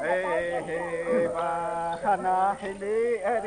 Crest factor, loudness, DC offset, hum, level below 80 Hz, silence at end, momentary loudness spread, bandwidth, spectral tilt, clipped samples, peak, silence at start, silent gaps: 14 dB; -27 LUFS; under 0.1%; none; -58 dBFS; 0 s; 5 LU; 10 kHz; -5.5 dB/octave; under 0.1%; -14 dBFS; 0 s; none